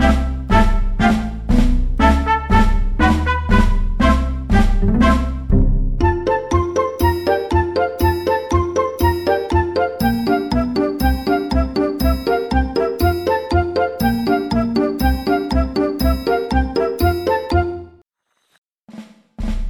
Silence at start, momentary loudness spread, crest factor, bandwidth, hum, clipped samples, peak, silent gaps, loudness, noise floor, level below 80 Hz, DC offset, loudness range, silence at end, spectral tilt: 0 s; 4 LU; 14 dB; 17.5 kHz; none; under 0.1%; -2 dBFS; 18.58-18.75 s; -18 LUFS; -68 dBFS; -20 dBFS; under 0.1%; 2 LU; 0 s; -7 dB/octave